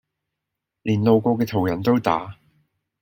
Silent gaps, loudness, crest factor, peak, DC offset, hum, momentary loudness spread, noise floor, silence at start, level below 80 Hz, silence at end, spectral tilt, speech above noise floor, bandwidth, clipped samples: none; -21 LUFS; 20 dB; -2 dBFS; under 0.1%; none; 10 LU; -83 dBFS; 0.85 s; -58 dBFS; 0.7 s; -8 dB/octave; 63 dB; 16.5 kHz; under 0.1%